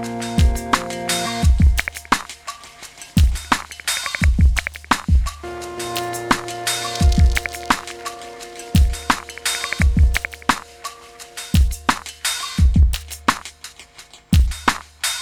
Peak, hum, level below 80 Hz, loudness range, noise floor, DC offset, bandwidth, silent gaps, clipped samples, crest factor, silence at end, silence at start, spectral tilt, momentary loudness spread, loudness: 0 dBFS; none; -22 dBFS; 1 LU; -44 dBFS; under 0.1%; 18.5 kHz; none; under 0.1%; 18 dB; 0 s; 0 s; -4 dB/octave; 17 LU; -20 LUFS